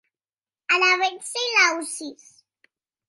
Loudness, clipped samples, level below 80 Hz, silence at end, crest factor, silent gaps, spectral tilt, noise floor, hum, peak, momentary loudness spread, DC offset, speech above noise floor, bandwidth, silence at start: -20 LUFS; under 0.1%; -86 dBFS; 0.95 s; 20 dB; none; 1.5 dB/octave; under -90 dBFS; none; -6 dBFS; 17 LU; under 0.1%; over 67 dB; 12 kHz; 0.7 s